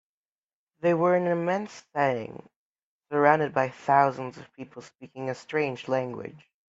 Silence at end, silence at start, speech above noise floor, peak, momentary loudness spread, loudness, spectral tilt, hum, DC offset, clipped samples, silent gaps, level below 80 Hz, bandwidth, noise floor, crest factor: 0.3 s; 0.85 s; over 64 dB; -4 dBFS; 21 LU; -26 LUFS; -7 dB/octave; none; under 0.1%; under 0.1%; 2.56-2.75 s, 2.83-3.01 s; -72 dBFS; 8 kHz; under -90 dBFS; 24 dB